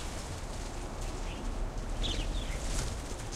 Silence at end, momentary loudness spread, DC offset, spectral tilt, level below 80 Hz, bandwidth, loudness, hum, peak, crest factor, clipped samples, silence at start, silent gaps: 0 s; 6 LU; under 0.1%; -4 dB/octave; -38 dBFS; 14 kHz; -38 LUFS; none; -18 dBFS; 16 dB; under 0.1%; 0 s; none